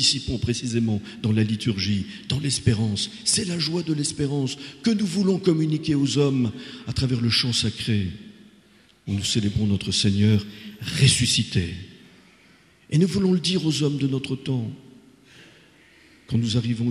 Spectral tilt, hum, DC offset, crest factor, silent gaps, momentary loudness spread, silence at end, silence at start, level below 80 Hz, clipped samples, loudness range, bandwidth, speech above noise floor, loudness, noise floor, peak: -5 dB/octave; none; under 0.1%; 18 dB; none; 9 LU; 0 s; 0 s; -48 dBFS; under 0.1%; 3 LU; 13 kHz; 33 dB; -23 LUFS; -56 dBFS; -4 dBFS